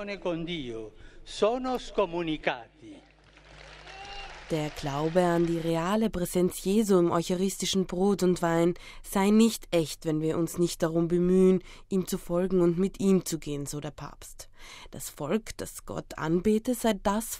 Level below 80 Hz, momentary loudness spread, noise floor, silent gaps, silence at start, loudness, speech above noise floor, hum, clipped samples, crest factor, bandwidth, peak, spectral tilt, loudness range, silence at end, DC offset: -48 dBFS; 17 LU; -53 dBFS; none; 0 s; -27 LUFS; 26 dB; none; under 0.1%; 18 dB; 16 kHz; -10 dBFS; -5.5 dB/octave; 7 LU; 0 s; under 0.1%